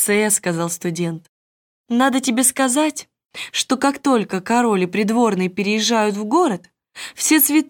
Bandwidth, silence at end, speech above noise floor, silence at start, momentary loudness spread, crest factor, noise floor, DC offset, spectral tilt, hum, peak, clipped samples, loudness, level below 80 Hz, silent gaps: 18 kHz; 0.05 s; over 72 dB; 0 s; 12 LU; 16 dB; under -90 dBFS; under 0.1%; -3.5 dB/octave; none; -4 dBFS; under 0.1%; -18 LUFS; -66 dBFS; 1.29-1.84 s